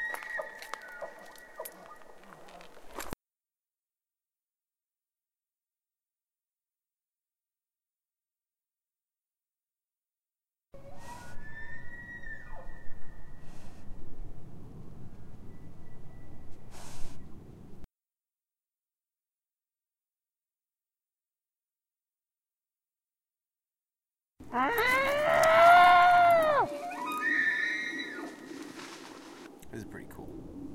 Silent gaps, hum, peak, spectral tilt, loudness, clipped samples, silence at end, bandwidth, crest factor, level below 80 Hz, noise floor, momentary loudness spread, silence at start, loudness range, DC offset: none; none; -10 dBFS; -3.5 dB/octave; -25 LUFS; under 0.1%; 0 s; 16 kHz; 24 dB; -52 dBFS; under -90 dBFS; 29 LU; 0 s; 27 LU; under 0.1%